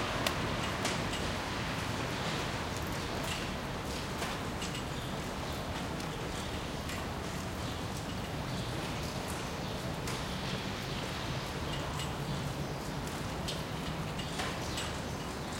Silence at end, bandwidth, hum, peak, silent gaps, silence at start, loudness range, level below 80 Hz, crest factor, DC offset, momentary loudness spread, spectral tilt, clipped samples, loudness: 0 s; 16.5 kHz; none; -12 dBFS; none; 0 s; 3 LU; -48 dBFS; 24 dB; under 0.1%; 4 LU; -4.5 dB/octave; under 0.1%; -37 LUFS